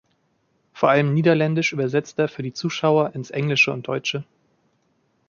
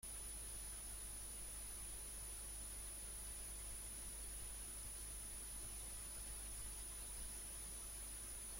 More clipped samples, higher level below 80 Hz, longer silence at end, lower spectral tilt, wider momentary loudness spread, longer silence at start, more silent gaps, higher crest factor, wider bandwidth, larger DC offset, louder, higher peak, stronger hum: neither; second, -66 dBFS vs -56 dBFS; first, 1.05 s vs 0 s; first, -6 dB/octave vs -1.5 dB/octave; first, 8 LU vs 0 LU; first, 0.75 s vs 0.05 s; neither; first, 20 dB vs 12 dB; second, 7.2 kHz vs 16.5 kHz; neither; first, -21 LUFS vs -49 LUFS; first, -4 dBFS vs -40 dBFS; second, none vs 50 Hz at -55 dBFS